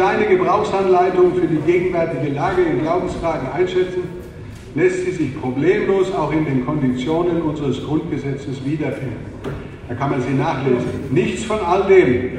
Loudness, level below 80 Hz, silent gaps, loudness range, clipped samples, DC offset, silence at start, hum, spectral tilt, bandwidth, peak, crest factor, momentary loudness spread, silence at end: -18 LUFS; -42 dBFS; none; 5 LU; under 0.1%; under 0.1%; 0 s; none; -7 dB/octave; 9.8 kHz; 0 dBFS; 16 dB; 12 LU; 0 s